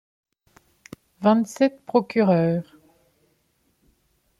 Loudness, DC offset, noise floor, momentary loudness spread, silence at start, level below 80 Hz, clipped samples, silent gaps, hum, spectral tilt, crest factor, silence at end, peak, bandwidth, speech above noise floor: -22 LUFS; under 0.1%; -68 dBFS; 5 LU; 1.2 s; -66 dBFS; under 0.1%; none; none; -7.5 dB/octave; 20 dB; 1.8 s; -6 dBFS; 13 kHz; 48 dB